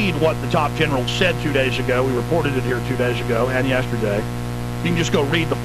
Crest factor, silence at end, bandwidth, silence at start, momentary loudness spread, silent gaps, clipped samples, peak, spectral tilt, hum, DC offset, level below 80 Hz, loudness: 16 dB; 0 s; 13.5 kHz; 0 s; 4 LU; none; under 0.1%; -2 dBFS; -5.5 dB/octave; 60 Hz at -25 dBFS; 0.3%; -36 dBFS; -20 LUFS